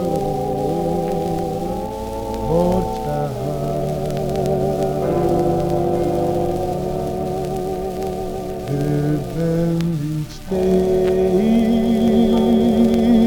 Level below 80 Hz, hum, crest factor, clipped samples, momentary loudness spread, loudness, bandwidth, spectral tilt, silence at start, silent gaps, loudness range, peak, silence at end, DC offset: -34 dBFS; none; 14 dB; under 0.1%; 9 LU; -19 LUFS; 18.5 kHz; -8 dB/octave; 0 s; none; 5 LU; -4 dBFS; 0 s; 0.2%